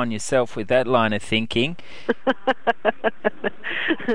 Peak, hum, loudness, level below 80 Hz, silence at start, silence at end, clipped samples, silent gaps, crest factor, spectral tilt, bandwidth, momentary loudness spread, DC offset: -4 dBFS; none; -23 LUFS; -56 dBFS; 0 s; 0 s; under 0.1%; none; 18 dB; -4.5 dB/octave; 11.5 kHz; 6 LU; 3%